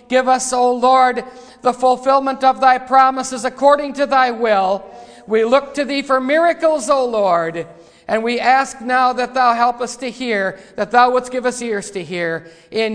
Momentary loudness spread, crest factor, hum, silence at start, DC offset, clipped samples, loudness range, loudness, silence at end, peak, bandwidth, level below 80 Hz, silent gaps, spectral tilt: 11 LU; 16 dB; none; 0.1 s; under 0.1%; under 0.1%; 3 LU; -16 LUFS; 0 s; 0 dBFS; 10.5 kHz; -56 dBFS; none; -3.5 dB/octave